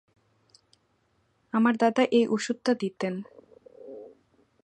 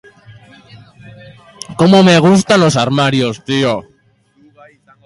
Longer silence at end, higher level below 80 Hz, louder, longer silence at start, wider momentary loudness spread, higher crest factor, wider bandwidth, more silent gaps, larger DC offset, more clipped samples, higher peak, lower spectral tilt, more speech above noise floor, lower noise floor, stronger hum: second, 0.55 s vs 1.25 s; second, -78 dBFS vs -50 dBFS; second, -26 LUFS vs -11 LUFS; first, 1.55 s vs 0.3 s; first, 23 LU vs 13 LU; first, 20 dB vs 14 dB; second, 9.8 kHz vs 11.5 kHz; neither; neither; neither; second, -8 dBFS vs 0 dBFS; about the same, -5.5 dB/octave vs -5.5 dB/octave; about the same, 45 dB vs 44 dB; first, -70 dBFS vs -54 dBFS; neither